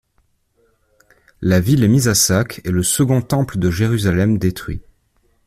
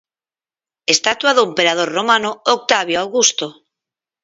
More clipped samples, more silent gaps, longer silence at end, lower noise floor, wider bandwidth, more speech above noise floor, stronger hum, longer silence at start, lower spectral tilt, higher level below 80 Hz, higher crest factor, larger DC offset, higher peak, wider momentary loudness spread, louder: neither; neither; about the same, 0.65 s vs 0.7 s; second, -62 dBFS vs under -90 dBFS; first, 16 kHz vs 7.8 kHz; second, 47 dB vs over 74 dB; neither; first, 1.4 s vs 0.9 s; first, -5 dB/octave vs -1 dB/octave; first, -40 dBFS vs -64 dBFS; about the same, 16 dB vs 18 dB; neither; about the same, -2 dBFS vs 0 dBFS; first, 9 LU vs 5 LU; about the same, -16 LUFS vs -15 LUFS